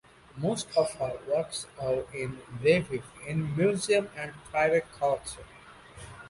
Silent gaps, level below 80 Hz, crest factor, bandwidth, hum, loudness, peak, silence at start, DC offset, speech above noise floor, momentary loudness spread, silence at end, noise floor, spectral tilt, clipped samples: none; -58 dBFS; 18 dB; 11.5 kHz; none; -29 LUFS; -12 dBFS; 0.35 s; under 0.1%; 20 dB; 17 LU; 0 s; -49 dBFS; -5 dB/octave; under 0.1%